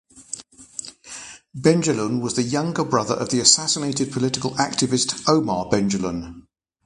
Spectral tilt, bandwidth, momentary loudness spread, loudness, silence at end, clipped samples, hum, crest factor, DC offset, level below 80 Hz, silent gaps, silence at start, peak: -3.5 dB/octave; 11.5 kHz; 18 LU; -20 LUFS; 0.45 s; under 0.1%; none; 22 dB; under 0.1%; -54 dBFS; none; 0.15 s; 0 dBFS